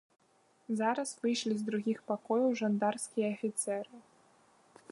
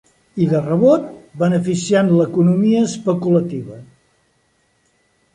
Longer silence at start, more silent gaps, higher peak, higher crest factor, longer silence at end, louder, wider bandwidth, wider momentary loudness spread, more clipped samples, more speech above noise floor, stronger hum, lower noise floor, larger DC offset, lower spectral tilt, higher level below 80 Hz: first, 0.7 s vs 0.35 s; neither; second, -16 dBFS vs -2 dBFS; about the same, 18 dB vs 16 dB; second, 0.9 s vs 1.5 s; second, -34 LUFS vs -16 LUFS; about the same, 11.5 kHz vs 10.5 kHz; second, 6 LU vs 14 LU; neither; second, 35 dB vs 46 dB; neither; first, -69 dBFS vs -62 dBFS; neither; second, -4.5 dB/octave vs -7 dB/octave; second, -84 dBFS vs -58 dBFS